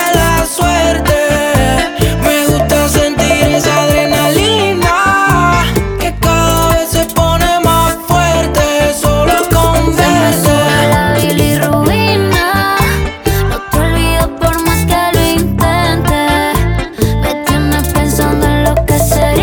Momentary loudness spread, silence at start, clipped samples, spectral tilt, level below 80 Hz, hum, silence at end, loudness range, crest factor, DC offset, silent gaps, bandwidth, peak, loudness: 4 LU; 0 s; under 0.1%; -4.5 dB/octave; -20 dBFS; none; 0 s; 2 LU; 10 dB; under 0.1%; none; over 20 kHz; 0 dBFS; -11 LUFS